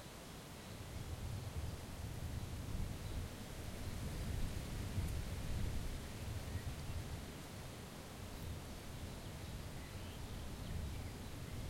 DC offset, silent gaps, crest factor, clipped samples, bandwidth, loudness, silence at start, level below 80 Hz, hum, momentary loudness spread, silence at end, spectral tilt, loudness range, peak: under 0.1%; none; 16 dB; under 0.1%; 16.5 kHz; -47 LUFS; 0 s; -50 dBFS; none; 6 LU; 0 s; -5 dB/octave; 4 LU; -28 dBFS